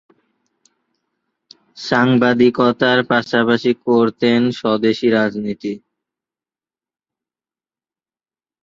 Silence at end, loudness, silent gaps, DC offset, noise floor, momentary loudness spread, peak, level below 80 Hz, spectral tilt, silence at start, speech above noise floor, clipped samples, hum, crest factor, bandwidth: 2.85 s; -16 LUFS; none; under 0.1%; under -90 dBFS; 11 LU; -2 dBFS; -60 dBFS; -6.5 dB/octave; 1.75 s; over 75 dB; under 0.1%; none; 18 dB; 7.4 kHz